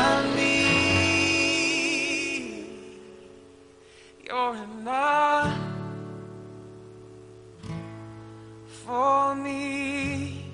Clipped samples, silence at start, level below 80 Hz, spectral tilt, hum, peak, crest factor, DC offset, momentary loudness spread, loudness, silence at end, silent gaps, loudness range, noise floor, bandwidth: under 0.1%; 0 s; -56 dBFS; -3.5 dB/octave; none; -8 dBFS; 20 dB; under 0.1%; 24 LU; -24 LUFS; 0 s; none; 10 LU; -52 dBFS; 10.5 kHz